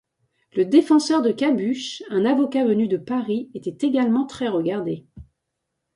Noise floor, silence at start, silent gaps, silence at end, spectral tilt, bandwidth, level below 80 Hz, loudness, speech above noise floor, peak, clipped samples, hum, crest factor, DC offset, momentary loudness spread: -79 dBFS; 0.55 s; none; 0.75 s; -5.5 dB/octave; 11.5 kHz; -60 dBFS; -21 LUFS; 58 dB; -4 dBFS; under 0.1%; none; 18 dB; under 0.1%; 10 LU